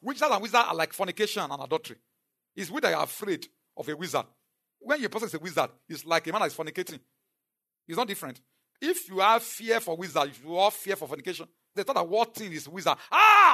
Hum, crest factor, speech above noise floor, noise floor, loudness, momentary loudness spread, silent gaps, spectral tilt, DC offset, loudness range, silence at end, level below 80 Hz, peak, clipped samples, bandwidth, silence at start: none; 22 dB; 60 dB; -87 dBFS; -27 LUFS; 14 LU; none; -3 dB/octave; under 0.1%; 5 LU; 0 s; -84 dBFS; -6 dBFS; under 0.1%; 13.5 kHz; 0.05 s